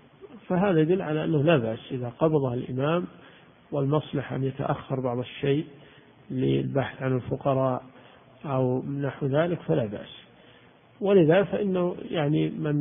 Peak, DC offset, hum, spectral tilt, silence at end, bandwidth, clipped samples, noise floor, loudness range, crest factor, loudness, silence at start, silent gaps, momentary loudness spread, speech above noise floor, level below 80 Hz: -8 dBFS; under 0.1%; none; -12 dB/octave; 0 s; 3.7 kHz; under 0.1%; -55 dBFS; 4 LU; 18 dB; -26 LUFS; 0.2 s; none; 10 LU; 30 dB; -58 dBFS